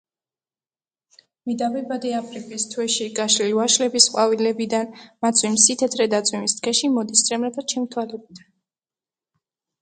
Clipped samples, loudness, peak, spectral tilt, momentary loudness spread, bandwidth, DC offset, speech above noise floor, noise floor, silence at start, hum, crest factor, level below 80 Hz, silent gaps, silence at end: under 0.1%; -20 LUFS; 0 dBFS; -1.5 dB/octave; 13 LU; 9.6 kHz; under 0.1%; over 69 dB; under -90 dBFS; 1.45 s; none; 22 dB; -72 dBFS; none; 1.45 s